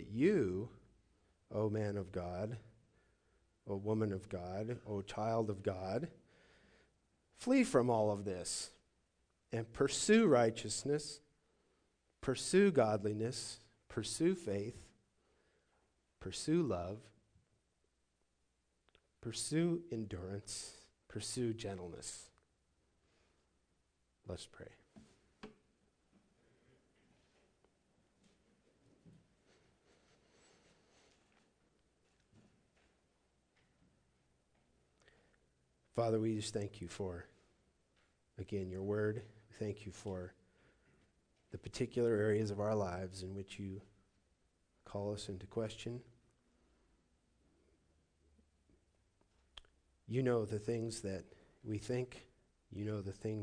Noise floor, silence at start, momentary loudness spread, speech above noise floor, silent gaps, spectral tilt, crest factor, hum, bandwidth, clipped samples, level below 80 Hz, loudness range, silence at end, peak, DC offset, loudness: -81 dBFS; 0 s; 19 LU; 43 dB; none; -5.5 dB/octave; 24 dB; none; 10 kHz; under 0.1%; -70 dBFS; 12 LU; 0 s; -18 dBFS; under 0.1%; -39 LUFS